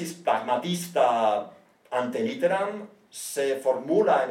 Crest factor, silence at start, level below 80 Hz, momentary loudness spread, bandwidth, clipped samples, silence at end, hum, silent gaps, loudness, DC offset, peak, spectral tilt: 16 dB; 0 s; -86 dBFS; 12 LU; 17 kHz; under 0.1%; 0 s; none; none; -26 LUFS; under 0.1%; -10 dBFS; -4.5 dB/octave